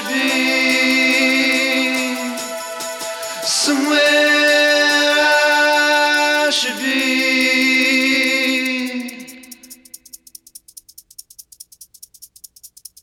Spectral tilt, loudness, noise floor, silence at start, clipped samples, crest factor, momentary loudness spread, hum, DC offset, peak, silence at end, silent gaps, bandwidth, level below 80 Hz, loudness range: -0.5 dB/octave; -14 LUFS; -44 dBFS; 0 s; under 0.1%; 14 dB; 13 LU; none; under 0.1%; -2 dBFS; 0.35 s; none; 17.5 kHz; -64 dBFS; 8 LU